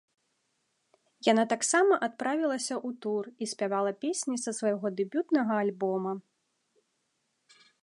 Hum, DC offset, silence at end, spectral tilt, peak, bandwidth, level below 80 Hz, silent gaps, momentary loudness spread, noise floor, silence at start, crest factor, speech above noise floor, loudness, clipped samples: none; under 0.1%; 1.6 s; -3.5 dB/octave; -10 dBFS; 11.5 kHz; -86 dBFS; none; 9 LU; -78 dBFS; 1.25 s; 20 dB; 49 dB; -29 LUFS; under 0.1%